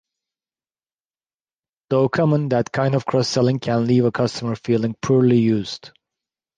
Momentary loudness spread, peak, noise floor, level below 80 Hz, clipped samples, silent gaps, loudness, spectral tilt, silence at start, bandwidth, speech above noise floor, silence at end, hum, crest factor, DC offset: 7 LU; -6 dBFS; under -90 dBFS; -58 dBFS; under 0.1%; none; -19 LUFS; -7 dB/octave; 1.9 s; 9.4 kHz; over 71 dB; 0.7 s; none; 16 dB; under 0.1%